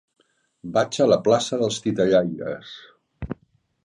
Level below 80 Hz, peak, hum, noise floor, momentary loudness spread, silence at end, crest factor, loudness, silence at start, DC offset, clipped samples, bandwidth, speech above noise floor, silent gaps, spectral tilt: -52 dBFS; -6 dBFS; none; -64 dBFS; 20 LU; 0.5 s; 18 dB; -21 LUFS; 0.65 s; under 0.1%; under 0.1%; 10.5 kHz; 42 dB; none; -5 dB/octave